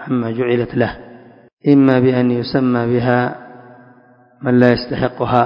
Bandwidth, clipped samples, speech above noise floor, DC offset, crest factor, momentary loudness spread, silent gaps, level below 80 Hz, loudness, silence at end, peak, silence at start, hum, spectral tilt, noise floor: 5.4 kHz; under 0.1%; 34 dB; under 0.1%; 16 dB; 10 LU; 1.53-1.57 s; -46 dBFS; -16 LUFS; 0 s; 0 dBFS; 0 s; none; -9.5 dB/octave; -48 dBFS